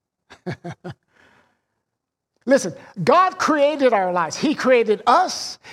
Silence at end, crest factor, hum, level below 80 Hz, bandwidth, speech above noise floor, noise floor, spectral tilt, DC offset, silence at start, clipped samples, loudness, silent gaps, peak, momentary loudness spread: 0 s; 18 dB; none; -66 dBFS; 13.5 kHz; 62 dB; -81 dBFS; -4.5 dB/octave; under 0.1%; 0.3 s; under 0.1%; -18 LUFS; none; -4 dBFS; 18 LU